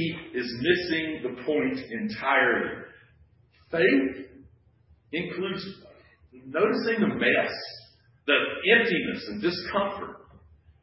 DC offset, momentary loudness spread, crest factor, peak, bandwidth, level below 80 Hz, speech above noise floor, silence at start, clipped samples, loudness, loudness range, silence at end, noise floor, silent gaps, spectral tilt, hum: under 0.1%; 15 LU; 22 dB; -6 dBFS; 5.8 kHz; -60 dBFS; 34 dB; 0 s; under 0.1%; -26 LUFS; 5 LU; 0.65 s; -61 dBFS; none; -9 dB/octave; none